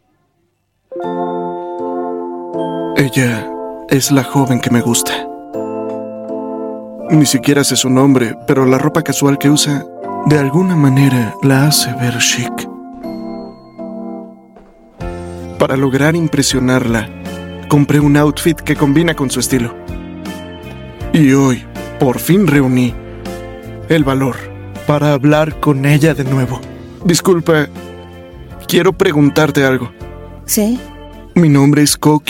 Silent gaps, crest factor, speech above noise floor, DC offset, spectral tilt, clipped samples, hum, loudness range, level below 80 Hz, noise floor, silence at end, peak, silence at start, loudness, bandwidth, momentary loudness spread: none; 14 dB; 51 dB; under 0.1%; -5 dB/octave; under 0.1%; none; 5 LU; -38 dBFS; -62 dBFS; 0.1 s; 0 dBFS; 0.9 s; -13 LUFS; 17 kHz; 18 LU